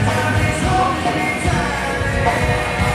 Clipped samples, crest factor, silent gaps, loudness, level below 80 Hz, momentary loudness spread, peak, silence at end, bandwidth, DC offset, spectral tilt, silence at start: under 0.1%; 14 dB; none; -18 LUFS; -28 dBFS; 2 LU; -4 dBFS; 0 s; 15 kHz; under 0.1%; -5 dB/octave; 0 s